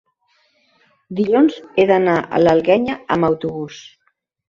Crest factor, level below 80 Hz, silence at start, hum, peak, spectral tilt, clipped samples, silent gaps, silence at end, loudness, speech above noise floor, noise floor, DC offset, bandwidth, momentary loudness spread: 16 dB; -54 dBFS; 1.1 s; none; -2 dBFS; -7 dB/octave; under 0.1%; none; 0.7 s; -16 LUFS; 51 dB; -67 dBFS; under 0.1%; 7.4 kHz; 15 LU